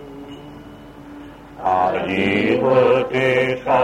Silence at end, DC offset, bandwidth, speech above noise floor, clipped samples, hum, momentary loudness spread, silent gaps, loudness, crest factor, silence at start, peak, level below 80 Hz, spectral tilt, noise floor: 0 s; under 0.1%; 9.8 kHz; 22 dB; under 0.1%; none; 23 LU; none; -18 LUFS; 16 dB; 0 s; -4 dBFS; -50 dBFS; -6.5 dB/octave; -39 dBFS